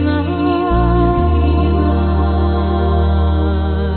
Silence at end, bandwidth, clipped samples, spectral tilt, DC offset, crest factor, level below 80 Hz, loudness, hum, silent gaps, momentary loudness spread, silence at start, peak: 0 s; 4.4 kHz; under 0.1%; -7.5 dB/octave; under 0.1%; 10 dB; -18 dBFS; -15 LUFS; none; none; 3 LU; 0 s; -2 dBFS